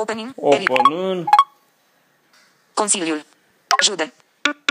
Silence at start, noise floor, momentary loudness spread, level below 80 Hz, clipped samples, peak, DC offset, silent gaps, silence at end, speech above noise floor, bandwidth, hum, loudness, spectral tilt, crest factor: 0 s; -60 dBFS; 11 LU; -74 dBFS; under 0.1%; 0 dBFS; under 0.1%; none; 0.15 s; 42 dB; 15.5 kHz; none; -18 LUFS; -1.5 dB/octave; 20 dB